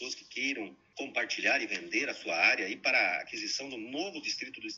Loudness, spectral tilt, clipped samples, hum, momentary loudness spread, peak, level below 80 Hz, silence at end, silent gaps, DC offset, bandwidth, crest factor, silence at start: -31 LUFS; -1 dB/octave; under 0.1%; none; 12 LU; -12 dBFS; -80 dBFS; 0 s; none; under 0.1%; 8 kHz; 20 dB; 0 s